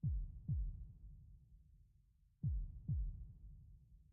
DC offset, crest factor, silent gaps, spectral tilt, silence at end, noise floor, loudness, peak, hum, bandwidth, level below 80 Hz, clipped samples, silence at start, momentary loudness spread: under 0.1%; 14 dB; none; -20.5 dB/octave; 0.1 s; -73 dBFS; -46 LUFS; -32 dBFS; none; 0.8 kHz; -48 dBFS; under 0.1%; 0.05 s; 20 LU